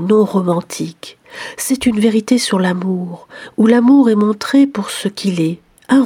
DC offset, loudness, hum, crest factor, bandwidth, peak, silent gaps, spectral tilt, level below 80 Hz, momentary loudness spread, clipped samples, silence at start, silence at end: under 0.1%; -14 LUFS; none; 14 dB; 16 kHz; 0 dBFS; none; -5.5 dB/octave; -54 dBFS; 18 LU; under 0.1%; 0 s; 0 s